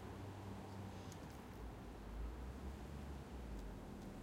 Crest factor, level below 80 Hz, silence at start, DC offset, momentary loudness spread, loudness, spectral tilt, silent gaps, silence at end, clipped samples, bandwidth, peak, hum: 12 dB; -54 dBFS; 0 s; under 0.1%; 3 LU; -53 LUFS; -6.5 dB/octave; none; 0 s; under 0.1%; 16 kHz; -38 dBFS; none